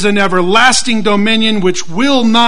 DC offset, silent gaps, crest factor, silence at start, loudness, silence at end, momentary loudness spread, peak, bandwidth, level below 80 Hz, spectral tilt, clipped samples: 10%; none; 12 dB; 0 s; -10 LUFS; 0 s; 6 LU; 0 dBFS; 11 kHz; -42 dBFS; -3.5 dB/octave; 0.3%